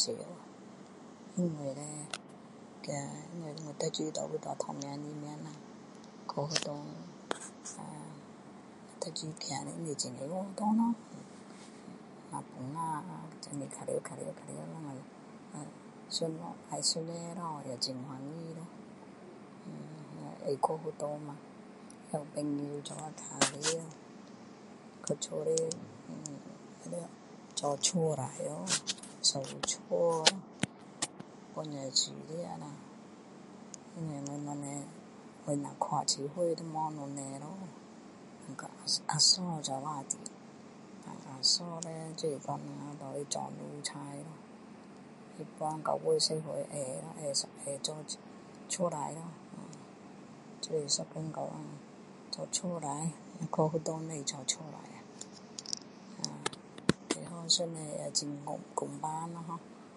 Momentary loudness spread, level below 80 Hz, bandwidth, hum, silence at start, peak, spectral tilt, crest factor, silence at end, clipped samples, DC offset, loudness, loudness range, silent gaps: 21 LU; -76 dBFS; 11.5 kHz; none; 0 s; -6 dBFS; -3 dB/octave; 32 dB; 0 s; under 0.1%; under 0.1%; -36 LUFS; 9 LU; none